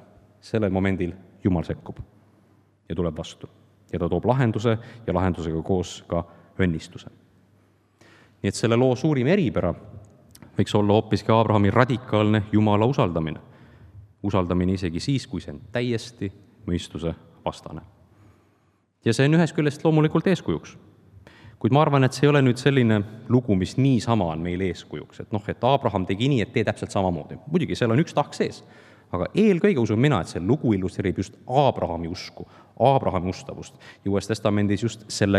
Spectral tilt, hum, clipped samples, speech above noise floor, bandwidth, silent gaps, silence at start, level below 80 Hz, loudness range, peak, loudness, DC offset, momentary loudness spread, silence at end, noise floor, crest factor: -7 dB/octave; none; under 0.1%; 42 dB; 12 kHz; none; 0.45 s; -54 dBFS; 7 LU; 0 dBFS; -23 LUFS; under 0.1%; 15 LU; 0 s; -65 dBFS; 24 dB